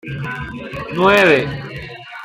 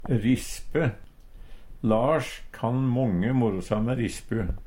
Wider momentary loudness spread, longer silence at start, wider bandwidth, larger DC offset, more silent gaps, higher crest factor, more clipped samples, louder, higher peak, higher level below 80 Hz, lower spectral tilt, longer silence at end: first, 19 LU vs 7 LU; about the same, 0.05 s vs 0 s; about the same, 16 kHz vs 16.5 kHz; neither; neither; about the same, 16 dB vs 16 dB; neither; first, -15 LUFS vs -26 LUFS; first, 0 dBFS vs -10 dBFS; about the same, -44 dBFS vs -40 dBFS; second, -5.5 dB/octave vs -7 dB/octave; about the same, 0 s vs 0 s